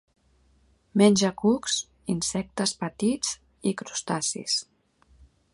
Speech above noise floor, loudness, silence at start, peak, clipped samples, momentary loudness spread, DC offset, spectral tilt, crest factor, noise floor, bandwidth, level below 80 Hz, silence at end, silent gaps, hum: 38 dB; -26 LUFS; 0.95 s; -6 dBFS; under 0.1%; 10 LU; under 0.1%; -4 dB/octave; 22 dB; -63 dBFS; 11.5 kHz; -60 dBFS; 0.9 s; none; none